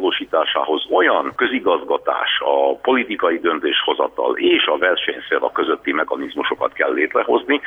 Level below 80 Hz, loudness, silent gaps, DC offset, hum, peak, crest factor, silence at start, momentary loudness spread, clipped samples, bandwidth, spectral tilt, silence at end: -60 dBFS; -18 LUFS; none; under 0.1%; none; -4 dBFS; 14 dB; 0 s; 5 LU; under 0.1%; 3.9 kHz; -5 dB/octave; 0 s